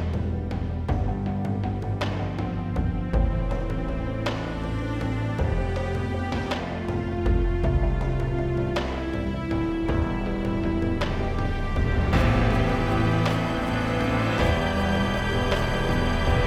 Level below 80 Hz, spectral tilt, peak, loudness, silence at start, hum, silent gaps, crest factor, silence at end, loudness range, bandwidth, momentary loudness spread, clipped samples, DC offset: -30 dBFS; -7 dB/octave; -8 dBFS; -26 LUFS; 0 s; none; none; 16 dB; 0 s; 4 LU; 13.5 kHz; 6 LU; under 0.1%; under 0.1%